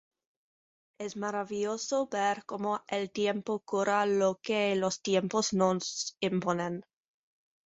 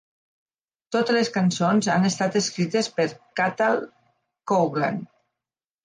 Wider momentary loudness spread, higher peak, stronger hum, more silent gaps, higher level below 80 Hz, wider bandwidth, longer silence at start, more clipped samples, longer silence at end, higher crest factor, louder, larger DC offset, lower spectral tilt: about the same, 7 LU vs 7 LU; about the same, -12 dBFS vs -10 dBFS; neither; neither; about the same, -72 dBFS vs -70 dBFS; second, 8.2 kHz vs 10 kHz; about the same, 1 s vs 0.9 s; neither; about the same, 0.85 s vs 0.8 s; about the same, 20 dB vs 16 dB; second, -31 LUFS vs -23 LUFS; neither; about the same, -4 dB/octave vs -5 dB/octave